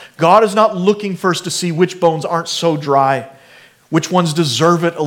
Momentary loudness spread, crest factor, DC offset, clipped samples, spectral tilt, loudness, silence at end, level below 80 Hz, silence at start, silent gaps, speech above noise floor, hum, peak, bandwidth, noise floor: 8 LU; 14 dB; under 0.1%; under 0.1%; -5 dB/octave; -15 LUFS; 0 s; -64 dBFS; 0 s; none; 31 dB; none; 0 dBFS; 17 kHz; -45 dBFS